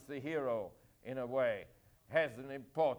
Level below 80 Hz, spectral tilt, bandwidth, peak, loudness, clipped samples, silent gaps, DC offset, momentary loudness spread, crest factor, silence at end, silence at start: -72 dBFS; -6.5 dB/octave; over 20 kHz; -18 dBFS; -38 LUFS; under 0.1%; none; under 0.1%; 14 LU; 20 dB; 0 s; 0 s